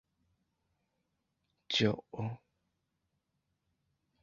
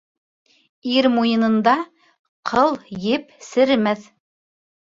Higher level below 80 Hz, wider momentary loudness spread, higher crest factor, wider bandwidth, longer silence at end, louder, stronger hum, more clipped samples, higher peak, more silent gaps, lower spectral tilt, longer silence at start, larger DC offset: second, -70 dBFS vs -60 dBFS; about the same, 12 LU vs 11 LU; first, 26 dB vs 18 dB; about the same, 7.2 kHz vs 7.6 kHz; first, 1.85 s vs 0.85 s; second, -34 LUFS vs -19 LUFS; neither; neither; second, -14 dBFS vs -4 dBFS; second, none vs 2.19-2.43 s; second, -4 dB/octave vs -5.5 dB/octave; first, 1.7 s vs 0.85 s; neither